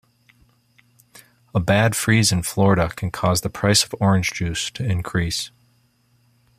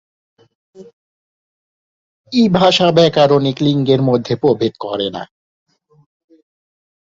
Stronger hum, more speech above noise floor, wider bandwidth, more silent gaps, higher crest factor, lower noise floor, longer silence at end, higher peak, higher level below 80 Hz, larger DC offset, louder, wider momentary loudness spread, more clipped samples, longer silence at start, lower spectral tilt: neither; second, 42 dB vs over 77 dB; first, 15.5 kHz vs 7.8 kHz; second, none vs 0.93-2.24 s; about the same, 20 dB vs 16 dB; second, -61 dBFS vs under -90 dBFS; second, 1.1 s vs 1.8 s; about the same, -2 dBFS vs -2 dBFS; first, -46 dBFS vs -54 dBFS; neither; second, -20 LUFS vs -14 LUFS; about the same, 8 LU vs 10 LU; neither; first, 1.55 s vs 0.8 s; second, -4.5 dB/octave vs -6.5 dB/octave